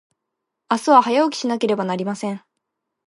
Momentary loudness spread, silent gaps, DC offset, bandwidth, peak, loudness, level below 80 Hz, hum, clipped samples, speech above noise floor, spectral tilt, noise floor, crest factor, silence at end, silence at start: 13 LU; none; under 0.1%; 11.5 kHz; 0 dBFS; -19 LUFS; -72 dBFS; none; under 0.1%; 62 dB; -5 dB/octave; -80 dBFS; 20 dB; 0.7 s; 0.7 s